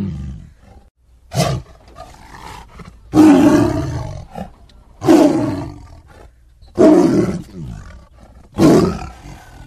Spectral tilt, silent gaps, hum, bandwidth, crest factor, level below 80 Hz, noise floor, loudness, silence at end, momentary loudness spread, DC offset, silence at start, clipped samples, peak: -7 dB/octave; 0.91-0.95 s; none; 14.5 kHz; 16 dB; -38 dBFS; -44 dBFS; -14 LUFS; 0 s; 25 LU; under 0.1%; 0 s; under 0.1%; 0 dBFS